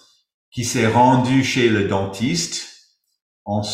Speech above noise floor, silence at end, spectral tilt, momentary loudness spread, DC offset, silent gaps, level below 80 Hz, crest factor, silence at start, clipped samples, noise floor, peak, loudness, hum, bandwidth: 36 dB; 0 s; -5 dB/octave; 16 LU; under 0.1%; 3.22-3.46 s; -54 dBFS; 16 dB; 0.55 s; under 0.1%; -53 dBFS; -4 dBFS; -18 LUFS; none; 15.5 kHz